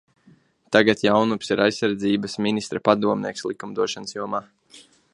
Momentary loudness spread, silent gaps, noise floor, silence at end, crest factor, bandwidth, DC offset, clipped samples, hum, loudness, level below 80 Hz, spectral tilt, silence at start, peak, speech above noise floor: 11 LU; none; -56 dBFS; 0.35 s; 22 dB; 11.5 kHz; under 0.1%; under 0.1%; none; -22 LUFS; -62 dBFS; -5 dB/octave; 0.7 s; 0 dBFS; 35 dB